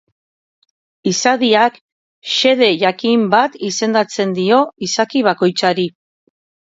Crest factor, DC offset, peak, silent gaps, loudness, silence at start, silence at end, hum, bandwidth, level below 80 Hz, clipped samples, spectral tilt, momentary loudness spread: 16 dB; under 0.1%; 0 dBFS; 1.81-2.22 s; -15 LUFS; 1.05 s; 0.8 s; none; 7.8 kHz; -66 dBFS; under 0.1%; -3.5 dB/octave; 7 LU